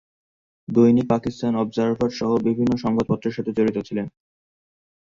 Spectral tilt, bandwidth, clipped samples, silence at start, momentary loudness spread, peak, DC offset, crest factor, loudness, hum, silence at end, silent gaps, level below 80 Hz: -8 dB/octave; 7.2 kHz; under 0.1%; 0.7 s; 11 LU; -4 dBFS; under 0.1%; 18 dB; -22 LUFS; none; 0.95 s; none; -54 dBFS